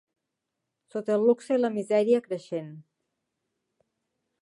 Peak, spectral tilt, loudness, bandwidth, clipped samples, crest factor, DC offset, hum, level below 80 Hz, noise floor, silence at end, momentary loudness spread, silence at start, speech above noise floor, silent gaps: -10 dBFS; -6.5 dB/octave; -26 LUFS; 11 kHz; under 0.1%; 18 dB; under 0.1%; none; -84 dBFS; -84 dBFS; 1.6 s; 13 LU; 0.95 s; 58 dB; none